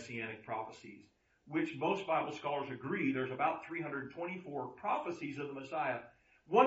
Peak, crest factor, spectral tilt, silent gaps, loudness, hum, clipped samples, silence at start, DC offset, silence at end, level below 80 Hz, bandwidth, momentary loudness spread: -14 dBFS; 24 dB; -4 dB/octave; none; -38 LUFS; none; under 0.1%; 0 s; under 0.1%; 0 s; -78 dBFS; 7.6 kHz; 8 LU